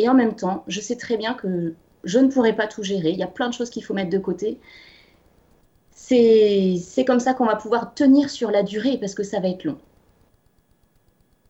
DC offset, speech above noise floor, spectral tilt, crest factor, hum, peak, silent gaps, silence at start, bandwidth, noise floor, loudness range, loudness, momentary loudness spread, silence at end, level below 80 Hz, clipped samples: under 0.1%; 41 dB; -5.5 dB/octave; 16 dB; none; -6 dBFS; none; 0 s; 8.2 kHz; -61 dBFS; 8 LU; -21 LUFS; 11 LU; 1.7 s; -60 dBFS; under 0.1%